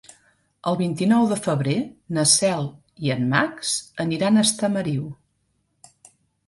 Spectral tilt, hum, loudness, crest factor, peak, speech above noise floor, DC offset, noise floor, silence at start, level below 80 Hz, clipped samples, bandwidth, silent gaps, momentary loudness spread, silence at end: -4 dB/octave; none; -21 LUFS; 20 dB; -4 dBFS; 48 dB; under 0.1%; -70 dBFS; 0.65 s; -60 dBFS; under 0.1%; 12 kHz; none; 11 LU; 1.35 s